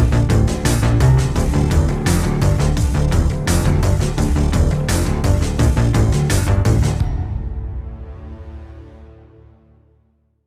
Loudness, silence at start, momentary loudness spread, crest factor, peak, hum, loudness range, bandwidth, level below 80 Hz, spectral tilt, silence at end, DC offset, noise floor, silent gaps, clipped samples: -17 LUFS; 0 s; 16 LU; 14 dB; -2 dBFS; none; 8 LU; 15.5 kHz; -22 dBFS; -6 dB/octave; 1.4 s; under 0.1%; -59 dBFS; none; under 0.1%